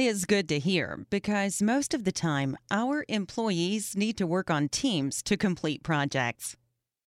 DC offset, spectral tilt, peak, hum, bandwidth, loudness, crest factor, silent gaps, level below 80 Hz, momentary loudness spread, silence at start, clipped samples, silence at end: under 0.1%; -4.5 dB/octave; -10 dBFS; none; 15.5 kHz; -29 LUFS; 18 dB; none; -60 dBFS; 5 LU; 0 s; under 0.1%; 0.55 s